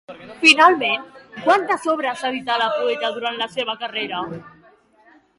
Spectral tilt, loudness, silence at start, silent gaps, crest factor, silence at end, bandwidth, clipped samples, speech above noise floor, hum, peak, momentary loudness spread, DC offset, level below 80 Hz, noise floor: -2.5 dB/octave; -18 LUFS; 0.1 s; none; 20 dB; 0.9 s; 11.5 kHz; under 0.1%; 35 dB; none; 0 dBFS; 15 LU; under 0.1%; -66 dBFS; -54 dBFS